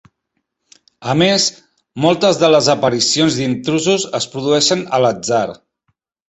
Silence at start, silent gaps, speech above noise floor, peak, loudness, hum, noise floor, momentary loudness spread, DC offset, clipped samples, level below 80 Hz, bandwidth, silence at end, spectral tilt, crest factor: 1 s; none; 58 dB; 0 dBFS; -15 LUFS; none; -72 dBFS; 8 LU; under 0.1%; under 0.1%; -56 dBFS; 8.2 kHz; 0.75 s; -4 dB/octave; 16 dB